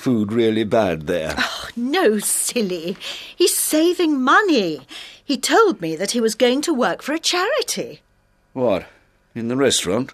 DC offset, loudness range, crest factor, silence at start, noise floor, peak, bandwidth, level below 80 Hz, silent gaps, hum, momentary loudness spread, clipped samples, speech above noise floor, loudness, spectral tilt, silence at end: under 0.1%; 4 LU; 16 dB; 0 s; -60 dBFS; -2 dBFS; 14 kHz; -54 dBFS; none; none; 12 LU; under 0.1%; 41 dB; -19 LUFS; -3 dB/octave; 0 s